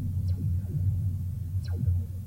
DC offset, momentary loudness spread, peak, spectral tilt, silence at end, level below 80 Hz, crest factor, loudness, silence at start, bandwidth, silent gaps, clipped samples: under 0.1%; 4 LU; -18 dBFS; -9 dB/octave; 0 s; -44 dBFS; 12 dB; -30 LUFS; 0 s; 16 kHz; none; under 0.1%